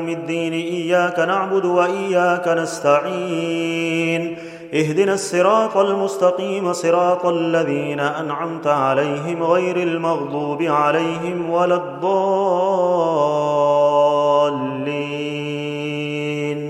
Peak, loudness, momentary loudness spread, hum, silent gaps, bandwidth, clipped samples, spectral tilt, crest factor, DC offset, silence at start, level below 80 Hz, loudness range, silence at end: -2 dBFS; -19 LUFS; 8 LU; none; none; 13.5 kHz; under 0.1%; -5.5 dB/octave; 16 dB; under 0.1%; 0 s; -68 dBFS; 2 LU; 0 s